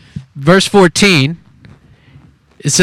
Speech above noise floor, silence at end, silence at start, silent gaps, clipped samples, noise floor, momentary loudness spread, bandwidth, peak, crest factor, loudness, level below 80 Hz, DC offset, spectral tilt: 34 dB; 0 s; 0.15 s; none; 0.2%; -44 dBFS; 18 LU; 16 kHz; 0 dBFS; 14 dB; -10 LUFS; -44 dBFS; under 0.1%; -4 dB/octave